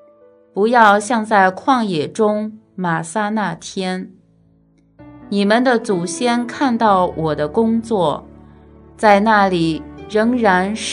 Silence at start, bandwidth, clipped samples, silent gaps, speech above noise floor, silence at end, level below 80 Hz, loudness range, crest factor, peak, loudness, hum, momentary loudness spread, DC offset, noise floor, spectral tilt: 0.55 s; 11 kHz; under 0.1%; none; 38 dB; 0 s; -50 dBFS; 5 LU; 18 dB; 0 dBFS; -16 LUFS; none; 12 LU; under 0.1%; -54 dBFS; -5 dB/octave